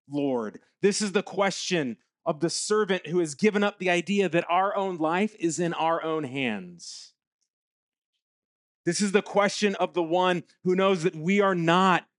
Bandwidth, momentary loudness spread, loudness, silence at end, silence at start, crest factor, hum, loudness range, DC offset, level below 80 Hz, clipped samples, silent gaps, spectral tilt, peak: 11.5 kHz; 8 LU; -26 LUFS; 0.2 s; 0.1 s; 20 dB; none; 6 LU; under 0.1%; -80 dBFS; under 0.1%; 7.27-7.39 s, 7.50-7.92 s, 7.98-8.13 s, 8.22-8.84 s; -4.5 dB/octave; -6 dBFS